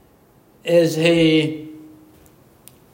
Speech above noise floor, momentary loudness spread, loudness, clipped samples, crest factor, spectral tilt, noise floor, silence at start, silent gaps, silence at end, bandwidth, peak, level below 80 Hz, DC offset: 37 dB; 18 LU; -17 LUFS; under 0.1%; 18 dB; -5.5 dB/octave; -53 dBFS; 0.65 s; none; 1.15 s; 16.5 kHz; -2 dBFS; -56 dBFS; under 0.1%